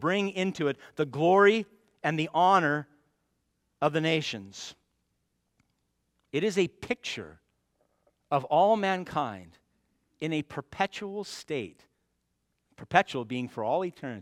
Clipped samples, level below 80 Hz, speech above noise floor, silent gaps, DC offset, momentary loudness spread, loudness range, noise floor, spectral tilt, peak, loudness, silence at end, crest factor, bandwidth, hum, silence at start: under 0.1%; -70 dBFS; 50 dB; none; under 0.1%; 15 LU; 9 LU; -78 dBFS; -5.5 dB/octave; -6 dBFS; -28 LUFS; 0 s; 24 dB; 13 kHz; none; 0 s